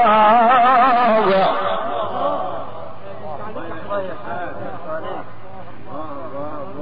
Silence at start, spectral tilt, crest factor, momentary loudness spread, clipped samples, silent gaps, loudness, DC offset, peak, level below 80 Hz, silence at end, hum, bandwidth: 0 s; -3 dB/octave; 14 dB; 22 LU; under 0.1%; none; -17 LUFS; 5%; -4 dBFS; -54 dBFS; 0 s; none; 5 kHz